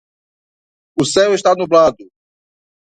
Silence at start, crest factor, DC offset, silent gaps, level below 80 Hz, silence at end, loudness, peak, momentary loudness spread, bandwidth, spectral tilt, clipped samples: 0.95 s; 16 dB; under 0.1%; none; -54 dBFS; 0.95 s; -14 LUFS; 0 dBFS; 7 LU; 11 kHz; -4 dB/octave; under 0.1%